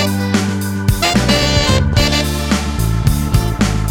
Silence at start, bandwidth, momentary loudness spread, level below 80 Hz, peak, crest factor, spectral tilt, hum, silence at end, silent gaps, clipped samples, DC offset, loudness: 0 s; 18.5 kHz; 5 LU; -22 dBFS; 0 dBFS; 14 dB; -4.5 dB/octave; none; 0 s; none; under 0.1%; under 0.1%; -15 LUFS